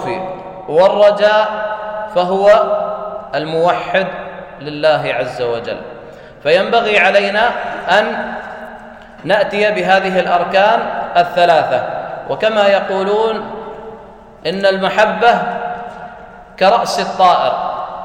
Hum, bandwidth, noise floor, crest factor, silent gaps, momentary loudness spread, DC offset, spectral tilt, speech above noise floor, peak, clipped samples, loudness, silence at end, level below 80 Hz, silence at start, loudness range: none; 10.5 kHz; -36 dBFS; 14 dB; none; 17 LU; under 0.1%; -4.5 dB/octave; 23 dB; 0 dBFS; under 0.1%; -14 LUFS; 0 s; -50 dBFS; 0 s; 4 LU